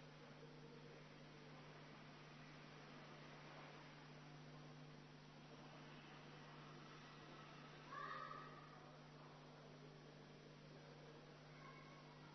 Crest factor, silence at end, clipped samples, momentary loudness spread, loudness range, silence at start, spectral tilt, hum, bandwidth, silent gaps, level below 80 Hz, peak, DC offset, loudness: 20 dB; 0 s; under 0.1%; 5 LU; 4 LU; 0 s; -4 dB/octave; none; 6.2 kHz; none; -82 dBFS; -40 dBFS; under 0.1%; -60 LUFS